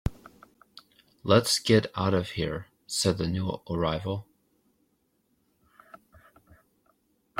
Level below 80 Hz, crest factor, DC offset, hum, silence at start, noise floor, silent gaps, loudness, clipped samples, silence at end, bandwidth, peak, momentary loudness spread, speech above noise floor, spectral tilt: -52 dBFS; 24 dB; under 0.1%; none; 0.05 s; -72 dBFS; none; -27 LUFS; under 0.1%; 1.45 s; 16.5 kHz; -6 dBFS; 14 LU; 46 dB; -5 dB/octave